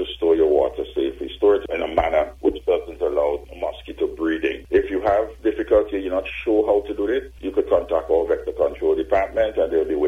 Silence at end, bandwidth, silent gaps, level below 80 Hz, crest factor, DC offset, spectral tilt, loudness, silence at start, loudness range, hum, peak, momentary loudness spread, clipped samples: 0 s; 6.6 kHz; none; -42 dBFS; 16 dB; under 0.1%; -7 dB/octave; -21 LUFS; 0 s; 2 LU; none; -4 dBFS; 6 LU; under 0.1%